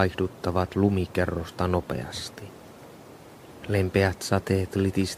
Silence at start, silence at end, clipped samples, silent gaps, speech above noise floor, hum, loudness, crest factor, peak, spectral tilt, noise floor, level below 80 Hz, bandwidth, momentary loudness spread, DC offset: 0 s; 0 s; under 0.1%; none; 21 dB; none; -26 LUFS; 20 dB; -6 dBFS; -6 dB/octave; -47 dBFS; -48 dBFS; 15 kHz; 22 LU; under 0.1%